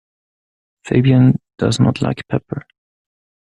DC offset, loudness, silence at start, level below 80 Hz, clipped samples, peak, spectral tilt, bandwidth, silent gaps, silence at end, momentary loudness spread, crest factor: under 0.1%; -16 LUFS; 0.85 s; -48 dBFS; under 0.1%; -2 dBFS; -7 dB/octave; 10.5 kHz; none; 1 s; 12 LU; 16 dB